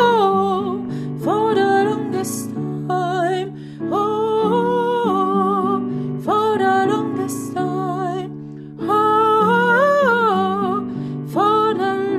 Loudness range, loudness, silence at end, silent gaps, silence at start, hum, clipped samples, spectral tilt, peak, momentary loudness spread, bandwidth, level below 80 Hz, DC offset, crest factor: 4 LU; -18 LUFS; 0 s; none; 0 s; none; under 0.1%; -6 dB/octave; -2 dBFS; 11 LU; 15 kHz; -60 dBFS; under 0.1%; 16 dB